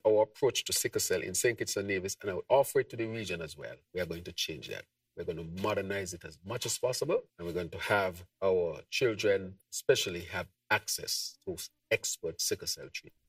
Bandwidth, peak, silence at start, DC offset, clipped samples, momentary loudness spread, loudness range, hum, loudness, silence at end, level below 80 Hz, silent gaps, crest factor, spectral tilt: 16 kHz; -12 dBFS; 0.05 s; under 0.1%; under 0.1%; 12 LU; 5 LU; none; -33 LUFS; 0.2 s; -64 dBFS; none; 22 dB; -3 dB/octave